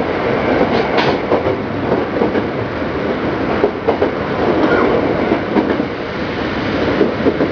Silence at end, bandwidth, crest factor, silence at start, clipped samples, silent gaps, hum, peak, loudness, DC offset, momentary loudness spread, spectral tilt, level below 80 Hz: 0 s; 5.4 kHz; 16 dB; 0 s; under 0.1%; none; none; 0 dBFS; -16 LUFS; under 0.1%; 6 LU; -7.5 dB/octave; -38 dBFS